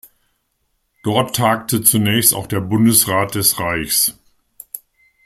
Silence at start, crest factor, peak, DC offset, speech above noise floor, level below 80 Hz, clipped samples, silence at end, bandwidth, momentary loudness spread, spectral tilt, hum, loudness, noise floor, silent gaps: 1.05 s; 18 dB; 0 dBFS; under 0.1%; 52 dB; -50 dBFS; under 0.1%; 0.5 s; 16.5 kHz; 16 LU; -3.5 dB/octave; none; -15 LUFS; -68 dBFS; none